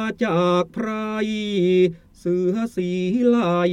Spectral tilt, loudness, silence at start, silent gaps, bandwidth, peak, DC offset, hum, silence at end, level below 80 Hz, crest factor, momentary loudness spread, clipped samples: -7 dB/octave; -21 LUFS; 0 s; none; 10.5 kHz; -6 dBFS; under 0.1%; none; 0 s; -56 dBFS; 14 dB; 7 LU; under 0.1%